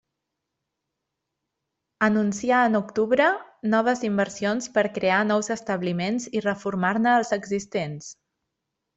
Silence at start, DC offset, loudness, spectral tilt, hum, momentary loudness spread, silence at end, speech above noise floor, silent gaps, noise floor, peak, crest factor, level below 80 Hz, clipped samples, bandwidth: 2 s; under 0.1%; -24 LUFS; -5 dB/octave; none; 8 LU; 0.85 s; 59 dB; none; -82 dBFS; -6 dBFS; 18 dB; -66 dBFS; under 0.1%; 8.2 kHz